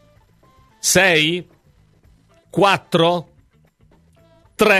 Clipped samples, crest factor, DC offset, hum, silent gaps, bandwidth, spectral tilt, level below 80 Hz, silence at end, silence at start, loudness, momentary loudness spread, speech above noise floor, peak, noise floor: under 0.1%; 20 dB; under 0.1%; none; none; 16 kHz; -3 dB/octave; -54 dBFS; 0 s; 0.85 s; -16 LUFS; 14 LU; 40 dB; 0 dBFS; -56 dBFS